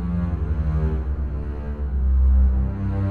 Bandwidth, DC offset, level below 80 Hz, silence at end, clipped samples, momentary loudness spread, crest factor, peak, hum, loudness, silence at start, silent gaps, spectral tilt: 2.8 kHz; under 0.1%; -22 dBFS; 0 s; under 0.1%; 10 LU; 10 dB; -10 dBFS; none; -23 LUFS; 0 s; none; -11 dB/octave